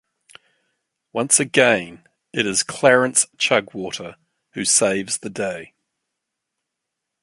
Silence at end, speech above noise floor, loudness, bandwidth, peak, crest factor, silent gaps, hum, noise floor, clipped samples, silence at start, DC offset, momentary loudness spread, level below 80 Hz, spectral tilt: 1.55 s; 61 dB; -18 LUFS; 12 kHz; 0 dBFS; 22 dB; none; none; -81 dBFS; under 0.1%; 1.15 s; under 0.1%; 16 LU; -64 dBFS; -2 dB/octave